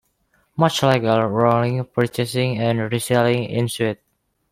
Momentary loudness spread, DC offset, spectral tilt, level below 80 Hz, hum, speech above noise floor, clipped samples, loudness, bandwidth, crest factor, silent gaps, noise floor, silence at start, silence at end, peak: 6 LU; under 0.1%; -6 dB/octave; -56 dBFS; none; 45 dB; under 0.1%; -20 LUFS; 16 kHz; 18 dB; none; -64 dBFS; 0.55 s; 0.55 s; -2 dBFS